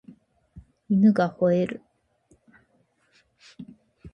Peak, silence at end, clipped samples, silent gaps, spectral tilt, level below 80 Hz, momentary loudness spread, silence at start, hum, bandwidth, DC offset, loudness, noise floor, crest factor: -10 dBFS; 0.05 s; under 0.1%; none; -9 dB/octave; -60 dBFS; 26 LU; 0.55 s; none; 6.4 kHz; under 0.1%; -22 LUFS; -67 dBFS; 18 dB